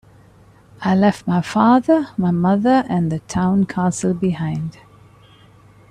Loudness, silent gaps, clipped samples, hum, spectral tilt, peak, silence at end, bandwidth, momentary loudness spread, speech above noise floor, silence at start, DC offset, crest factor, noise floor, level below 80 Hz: -18 LUFS; none; under 0.1%; none; -7 dB/octave; -2 dBFS; 1.2 s; 10.5 kHz; 9 LU; 31 dB; 0.8 s; under 0.1%; 16 dB; -48 dBFS; -52 dBFS